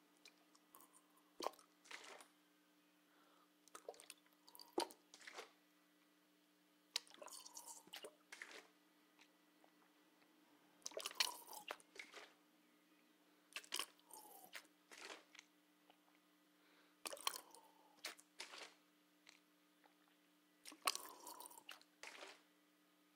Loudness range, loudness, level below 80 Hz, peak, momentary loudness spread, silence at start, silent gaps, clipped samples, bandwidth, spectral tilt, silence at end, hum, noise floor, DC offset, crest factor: 9 LU; -51 LUFS; under -90 dBFS; -20 dBFS; 21 LU; 0 s; none; under 0.1%; 16.5 kHz; 0.5 dB/octave; 0 s; none; -76 dBFS; under 0.1%; 36 dB